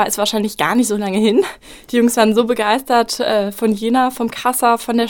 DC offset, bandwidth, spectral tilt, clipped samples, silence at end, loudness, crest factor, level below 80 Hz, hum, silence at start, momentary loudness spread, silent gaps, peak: under 0.1%; 17.5 kHz; -3.5 dB/octave; under 0.1%; 0 s; -16 LUFS; 16 dB; -52 dBFS; none; 0 s; 5 LU; none; 0 dBFS